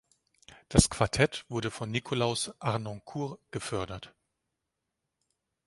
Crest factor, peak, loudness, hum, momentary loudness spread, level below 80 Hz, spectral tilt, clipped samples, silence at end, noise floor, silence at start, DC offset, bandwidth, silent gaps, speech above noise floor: 28 dB; -4 dBFS; -30 LUFS; none; 13 LU; -46 dBFS; -4.5 dB/octave; under 0.1%; 1.6 s; -85 dBFS; 0.5 s; under 0.1%; 11.5 kHz; none; 55 dB